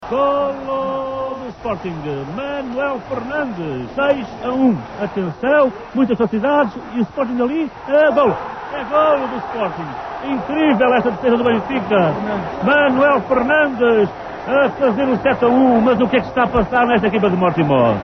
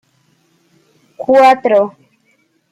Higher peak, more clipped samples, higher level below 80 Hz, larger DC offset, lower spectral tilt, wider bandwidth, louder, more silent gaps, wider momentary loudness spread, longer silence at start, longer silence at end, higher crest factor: about the same, -4 dBFS vs -2 dBFS; neither; first, -44 dBFS vs -64 dBFS; neither; first, -8 dB/octave vs -5 dB/octave; second, 6.4 kHz vs 13 kHz; second, -17 LUFS vs -11 LUFS; neither; about the same, 11 LU vs 13 LU; second, 0 s vs 1.2 s; second, 0 s vs 0.8 s; about the same, 12 dB vs 14 dB